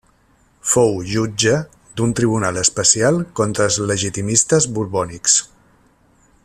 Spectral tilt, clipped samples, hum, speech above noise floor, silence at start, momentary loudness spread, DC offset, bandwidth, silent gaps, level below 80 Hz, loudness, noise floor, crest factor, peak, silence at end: -3.5 dB/octave; under 0.1%; none; 39 dB; 0.65 s; 8 LU; under 0.1%; 14 kHz; none; -48 dBFS; -17 LUFS; -56 dBFS; 18 dB; 0 dBFS; 1 s